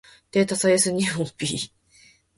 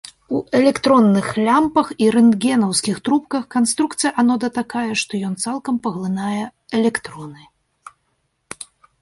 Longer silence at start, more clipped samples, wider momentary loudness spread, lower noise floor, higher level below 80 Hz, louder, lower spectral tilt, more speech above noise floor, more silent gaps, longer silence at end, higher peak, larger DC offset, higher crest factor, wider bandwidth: about the same, 0.35 s vs 0.3 s; neither; second, 10 LU vs 15 LU; second, -56 dBFS vs -68 dBFS; about the same, -60 dBFS vs -58 dBFS; second, -23 LUFS vs -18 LUFS; about the same, -3.5 dB/octave vs -4.5 dB/octave; second, 34 dB vs 51 dB; neither; second, 0.7 s vs 1.65 s; second, -8 dBFS vs -2 dBFS; neither; about the same, 18 dB vs 16 dB; about the same, 11.5 kHz vs 11.5 kHz